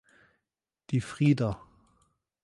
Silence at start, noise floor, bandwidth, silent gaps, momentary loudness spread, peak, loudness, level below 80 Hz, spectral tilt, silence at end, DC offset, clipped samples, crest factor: 0.9 s; -88 dBFS; 11.5 kHz; none; 9 LU; -12 dBFS; -28 LUFS; -58 dBFS; -7.5 dB/octave; 0.9 s; under 0.1%; under 0.1%; 20 dB